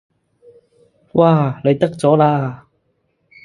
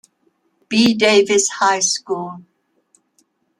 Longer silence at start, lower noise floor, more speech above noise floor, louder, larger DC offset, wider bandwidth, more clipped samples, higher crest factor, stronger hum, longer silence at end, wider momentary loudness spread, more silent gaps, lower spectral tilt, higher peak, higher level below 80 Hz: first, 1.15 s vs 0.7 s; about the same, -65 dBFS vs -65 dBFS; about the same, 51 dB vs 49 dB; about the same, -15 LUFS vs -15 LUFS; neither; second, 11.5 kHz vs 13 kHz; neither; about the same, 18 dB vs 18 dB; neither; second, 0.9 s vs 1.2 s; second, 8 LU vs 13 LU; neither; first, -8.5 dB/octave vs -2.5 dB/octave; about the same, 0 dBFS vs -2 dBFS; first, -58 dBFS vs -64 dBFS